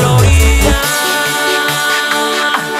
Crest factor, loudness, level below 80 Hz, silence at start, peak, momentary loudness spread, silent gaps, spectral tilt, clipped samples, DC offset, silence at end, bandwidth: 12 dB; -11 LUFS; -18 dBFS; 0 s; 0 dBFS; 4 LU; none; -3.5 dB/octave; under 0.1%; under 0.1%; 0 s; 16 kHz